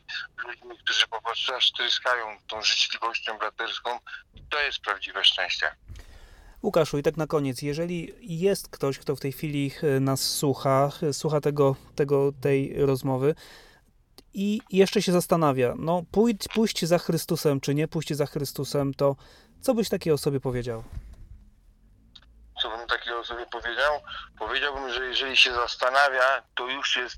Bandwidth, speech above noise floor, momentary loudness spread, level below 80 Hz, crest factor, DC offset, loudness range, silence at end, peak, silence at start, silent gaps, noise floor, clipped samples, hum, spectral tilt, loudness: 18 kHz; 33 dB; 11 LU; -52 dBFS; 22 dB; under 0.1%; 6 LU; 0 s; -4 dBFS; 0.1 s; none; -59 dBFS; under 0.1%; none; -4.5 dB/octave; -25 LUFS